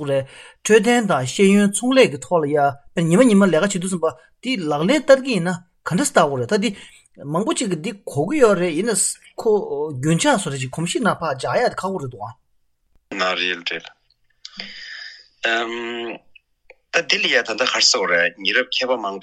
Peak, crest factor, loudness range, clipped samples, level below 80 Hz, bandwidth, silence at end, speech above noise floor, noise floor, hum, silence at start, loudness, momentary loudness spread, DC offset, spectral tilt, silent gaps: 0 dBFS; 20 dB; 9 LU; under 0.1%; -58 dBFS; 13.5 kHz; 0 s; 44 dB; -63 dBFS; none; 0 s; -19 LUFS; 17 LU; under 0.1%; -4 dB/octave; none